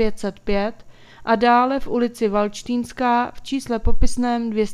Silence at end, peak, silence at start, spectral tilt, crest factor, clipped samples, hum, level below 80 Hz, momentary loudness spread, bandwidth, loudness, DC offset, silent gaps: 0 s; -2 dBFS; 0 s; -5.5 dB/octave; 16 dB; under 0.1%; none; -32 dBFS; 10 LU; 12.5 kHz; -21 LUFS; under 0.1%; none